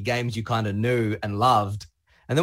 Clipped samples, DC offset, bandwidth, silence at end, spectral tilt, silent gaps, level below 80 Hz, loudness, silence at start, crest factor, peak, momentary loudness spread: under 0.1%; under 0.1%; 16 kHz; 0 s; -6 dB/octave; none; -54 dBFS; -24 LUFS; 0 s; 16 dB; -8 dBFS; 7 LU